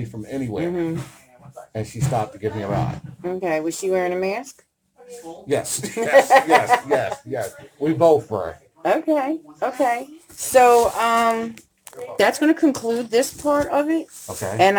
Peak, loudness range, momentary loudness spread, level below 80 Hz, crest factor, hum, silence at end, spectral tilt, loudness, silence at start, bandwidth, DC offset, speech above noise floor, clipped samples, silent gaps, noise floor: 0 dBFS; 7 LU; 16 LU; -54 dBFS; 20 dB; none; 0 s; -5 dB/octave; -20 LUFS; 0 s; over 20 kHz; under 0.1%; 23 dB; under 0.1%; none; -43 dBFS